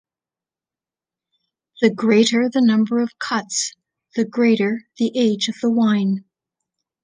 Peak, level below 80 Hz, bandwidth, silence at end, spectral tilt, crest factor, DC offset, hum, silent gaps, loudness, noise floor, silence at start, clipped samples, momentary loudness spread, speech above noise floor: -2 dBFS; -70 dBFS; 9.8 kHz; 0.85 s; -4.5 dB/octave; 18 dB; under 0.1%; none; none; -19 LUFS; under -90 dBFS; 1.8 s; under 0.1%; 8 LU; over 72 dB